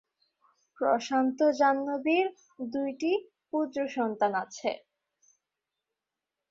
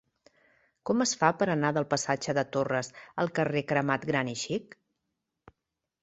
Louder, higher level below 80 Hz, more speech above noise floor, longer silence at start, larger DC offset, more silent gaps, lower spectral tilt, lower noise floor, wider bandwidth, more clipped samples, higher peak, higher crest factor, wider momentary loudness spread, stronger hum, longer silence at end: about the same, -29 LUFS vs -29 LUFS; second, -76 dBFS vs -68 dBFS; about the same, 60 dB vs 57 dB; about the same, 0.8 s vs 0.85 s; neither; neither; about the same, -4.5 dB/octave vs -4.5 dB/octave; about the same, -88 dBFS vs -86 dBFS; about the same, 7.6 kHz vs 8.2 kHz; neither; second, -12 dBFS vs -8 dBFS; second, 18 dB vs 24 dB; about the same, 9 LU vs 8 LU; neither; first, 1.7 s vs 1.4 s